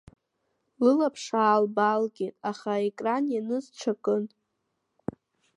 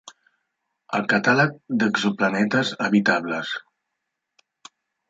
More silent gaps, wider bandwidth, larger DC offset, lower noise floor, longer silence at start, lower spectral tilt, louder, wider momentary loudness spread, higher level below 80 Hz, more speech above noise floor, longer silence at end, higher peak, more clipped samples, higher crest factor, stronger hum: neither; first, 10.5 kHz vs 7.8 kHz; neither; about the same, -79 dBFS vs -80 dBFS; first, 0.8 s vs 0.05 s; about the same, -5.5 dB/octave vs -5.5 dB/octave; second, -27 LUFS vs -21 LUFS; first, 16 LU vs 9 LU; about the same, -70 dBFS vs -68 dBFS; second, 53 dB vs 59 dB; second, 1.3 s vs 1.5 s; second, -10 dBFS vs -6 dBFS; neither; about the same, 18 dB vs 18 dB; neither